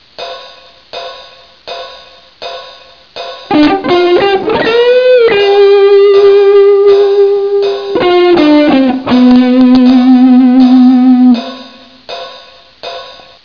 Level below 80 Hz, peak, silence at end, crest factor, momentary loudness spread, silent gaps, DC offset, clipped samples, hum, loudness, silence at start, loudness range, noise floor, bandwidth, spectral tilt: -44 dBFS; 0 dBFS; 0.35 s; 8 dB; 20 LU; none; 0.3%; under 0.1%; none; -6 LUFS; 0.2 s; 9 LU; -35 dBFS; 5.4 kHz; -6.5 dB/octave